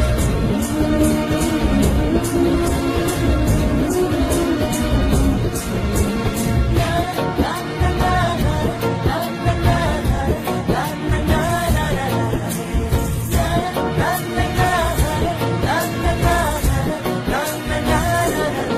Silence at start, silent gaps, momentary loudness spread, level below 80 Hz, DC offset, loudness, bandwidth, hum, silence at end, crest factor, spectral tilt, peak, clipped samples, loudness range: 0 s; none; 4 LU; -26 dBFS; under 0.1%; -19 LUFS; 15.5 kHz; none; 0 s; 14 dB; -5.5 dB/octave; -4 dBFS; under 0.1%; 2 LU